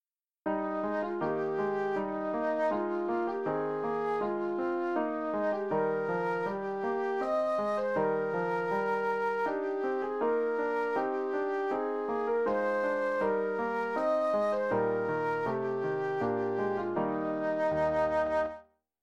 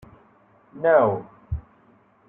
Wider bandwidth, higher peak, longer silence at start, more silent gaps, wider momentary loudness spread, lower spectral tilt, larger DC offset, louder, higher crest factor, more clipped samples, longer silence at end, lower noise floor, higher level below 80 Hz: first, 8.6 kHz vs 3.8 kHz; second, -16 dBFS vs -6 dBFS; second, 0.45 s vs 0.75 s; neither; second, 3 LU vs 17 LU; second, -7.5 dB/octave vs -10.5 dB/octave; neither; second, -31 LUFS vs -23 LUFS; second, 14 dB vs 20 dB; neither; second, 0.4 s vs 0.7 s; second, -52 dBFS vs -58 dBFS; second, -66 dBFS vs -44 dBFS